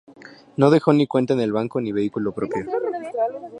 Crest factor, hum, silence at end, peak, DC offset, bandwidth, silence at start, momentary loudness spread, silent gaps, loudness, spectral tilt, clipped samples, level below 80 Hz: 20 dB; none; 0 s; -2 dBFS; under 0.1%; 9.8 kHz; 0.2 s; 10 LU; none; -21 LUFS; -8 dB/octave; under 0.1%; -62 dBFS